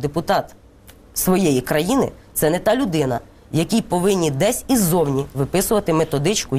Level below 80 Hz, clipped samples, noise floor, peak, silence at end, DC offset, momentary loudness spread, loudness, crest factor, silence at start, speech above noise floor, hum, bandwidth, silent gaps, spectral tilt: -42 dBFS; under 0.1%; -46 dBFS; -4 dBFS; 0 s; 0.2%; 6 LU; -19 LUFS; 14 dB; 0 s; 27 dB; none; 16 kHz; none; -5 dB/octave